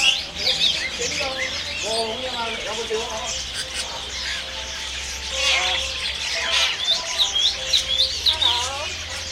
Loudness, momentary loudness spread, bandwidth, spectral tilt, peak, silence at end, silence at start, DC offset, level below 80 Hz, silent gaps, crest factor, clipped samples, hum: -21 LUFS; 9 LU; 16 kHz; 0 dB/octave; -4 dBFS; 0 s; 0 s; under 0.1%; -42 dBFS; none; 20 dB; under 0.1%; none